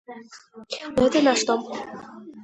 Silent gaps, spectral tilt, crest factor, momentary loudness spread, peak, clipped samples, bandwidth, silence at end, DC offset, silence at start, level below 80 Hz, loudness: none; -3.5 dB/octave; 20 dB; 23 LU; -6 dBFS; under 0.1%; 10.5 kHz; 0 s; under 0.1%; 0.1 s; -54 dBFS; -22 LUFS